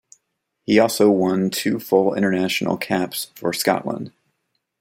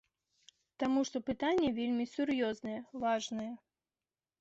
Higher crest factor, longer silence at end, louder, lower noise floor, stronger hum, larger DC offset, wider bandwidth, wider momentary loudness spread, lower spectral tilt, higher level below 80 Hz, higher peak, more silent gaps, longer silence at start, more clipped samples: about the same, 18 dB vs 14 dB; second, 0.7 s vs 0.85 s; first, -20 LUFS vs -35 LUFS; second, -74 dBFS vs under -90 dBFS; neither; neither; first, 16.5 kHz vs 8 kHz; about the same, 11 LU vs 10 LU; about the same, -4.5 dB/octave vs -4.5 dB/octave; about the same, -64 dBFS vs -68 dBFS; first, -2 dBFS vs -22 dBFS; neither; about the same, 0.7 s vs 0.8 s; neither